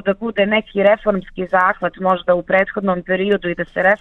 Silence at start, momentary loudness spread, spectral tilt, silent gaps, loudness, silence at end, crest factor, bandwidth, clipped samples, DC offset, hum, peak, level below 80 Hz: 0.05 s; 5 LU; -8 dB/octave; none; -17 LUFS; 0.05 s; 16 dB; 4.2 kHz; under 0.1%; under 0.1%; none; -2 dBFS; -48 dBFS